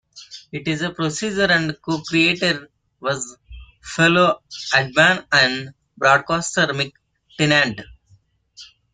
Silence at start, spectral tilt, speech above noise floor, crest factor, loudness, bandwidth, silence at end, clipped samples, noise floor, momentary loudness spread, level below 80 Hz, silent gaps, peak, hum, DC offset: 0.15 s; -4 dB/octave; 38 dB; 20 dB; -18 LUFS; 9.6 kHz; 0.3 s; under 0.1%; -57 dBFS; 15 LU; -52 dBFS; none; -2 dBFS; none; under 0.1%